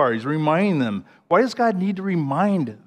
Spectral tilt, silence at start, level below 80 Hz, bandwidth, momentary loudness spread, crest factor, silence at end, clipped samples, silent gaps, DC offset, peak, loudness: -7.5 dB/octave; 0 s; -72 dBFS; 9.8 kHz; 5 LU; 16 dB; 0.1 s; under 0.1%; none; under 0.1%; -4 dBFS; -21 LUFS